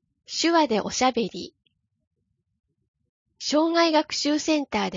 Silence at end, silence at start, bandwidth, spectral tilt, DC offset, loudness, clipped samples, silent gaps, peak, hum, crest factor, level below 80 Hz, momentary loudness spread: 0 s; 0.3 s; 7.6 kHz; -3 dB/octave; under 0.1%; -23 LUFS; under 0.1%; 2.07-2.11 s, 2.88-2.94 s, 3.09-3.26 s; -6 dBFS; none; 18 dB; -62 dBFS; 12 LU